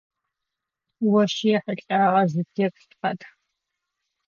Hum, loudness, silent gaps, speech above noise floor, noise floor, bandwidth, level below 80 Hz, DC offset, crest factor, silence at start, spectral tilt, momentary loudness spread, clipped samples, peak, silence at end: none; -23 LUFS; none; 63 dB; -85 dBFS; 7.4 kHz; -78 dBFS; under 0.1%; 18 dB; 1 s; -6.5 dB/octave; 10 LU; under 0.1%; -8 dBFS; 1 s